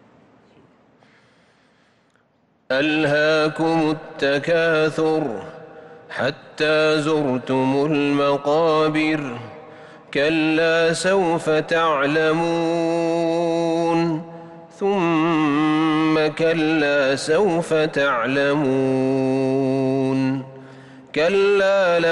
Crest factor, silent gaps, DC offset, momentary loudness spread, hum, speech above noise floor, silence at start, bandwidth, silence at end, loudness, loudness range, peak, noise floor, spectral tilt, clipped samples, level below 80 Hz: 10 dB; none; under 0.1%; 8 LU; none; 43 dB; 2.7 s; 11.5 kHz; 0 s; -19 LUFS; 3 LU; -10 dBFS; -62 dBFS; -5.5 dB/octave; under 0.1%; -60 dBFS